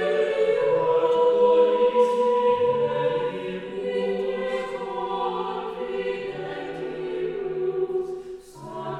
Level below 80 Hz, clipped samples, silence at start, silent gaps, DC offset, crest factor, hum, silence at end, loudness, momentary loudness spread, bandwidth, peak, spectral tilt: -62 dBFS; under 0.1%; 0 s; none; under 0.1%; 16 dB; none; 0 s; -24 LUFS; 13 LU; 9.2 kHz; -8 dBFS; -6 dB/octave